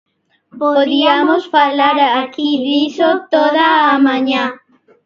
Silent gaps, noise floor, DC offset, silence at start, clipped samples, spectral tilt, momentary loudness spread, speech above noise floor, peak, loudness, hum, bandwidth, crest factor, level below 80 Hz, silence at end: none; -47 dBFS; under 0.1%; 0.55 s; under 0.1%; -4.5 dB/octave; 6 LU; 34 dB; 0 dBFS; -13 LUFS; none; 7 kHz; 14 dB; -66 dBFS; 0.5 s